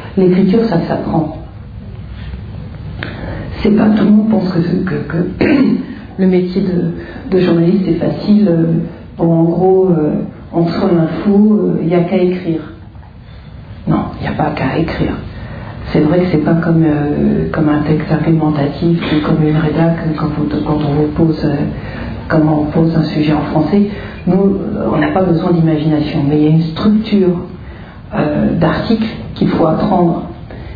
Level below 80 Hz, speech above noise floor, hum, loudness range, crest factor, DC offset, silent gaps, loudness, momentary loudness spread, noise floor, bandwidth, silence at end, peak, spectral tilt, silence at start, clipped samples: -34 dBFS; 21 dB; none; 4 LU; 14 dB; under 0.1%; none; -13 LUFS; 15 LU; -33 dBFS; 5 kHz; 0 s; 0 dBFS; -10.5 dB/octave; 0 s; under 0.1%